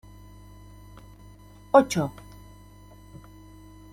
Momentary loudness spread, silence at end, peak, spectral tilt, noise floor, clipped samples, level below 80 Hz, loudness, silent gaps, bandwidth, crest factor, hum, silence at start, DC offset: 29 LU; 0.75 s; -4 dBFS; -5.5 dB/octave; -49 dBFS; under 0.1%; -52 dBFS; -23 LUFS; none; 16.5 kHz; 24 dB; 50 Hz at -50 dBFS; 1.75 s; under 0.1%